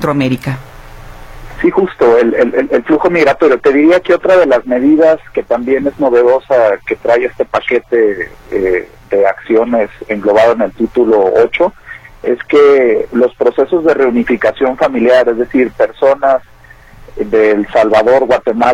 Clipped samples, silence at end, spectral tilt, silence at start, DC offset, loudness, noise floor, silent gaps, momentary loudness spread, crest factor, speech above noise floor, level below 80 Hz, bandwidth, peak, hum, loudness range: under 0.1%; 0 s; -7 dB/octave; 0 s; under 0.1%; -11 LUFS; -38 dBFS; none; 8 LU; 10 dB; 27 dB; -40 dBFS; 11.5 kHz; 0 dBFS; none; 3 LU